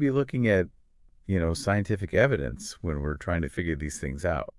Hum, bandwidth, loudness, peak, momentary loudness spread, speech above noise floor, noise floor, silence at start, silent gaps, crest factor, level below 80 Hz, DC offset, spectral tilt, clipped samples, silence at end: none; 12 kHz; -28 LUFS; -6 dBFS; 10 LU; 31 dB; -58 dBFS; 0 s; none; 22 dB; -42 dBFS; under 0.1%; -6.5 dB/octave; under 0.1%; 0.1 s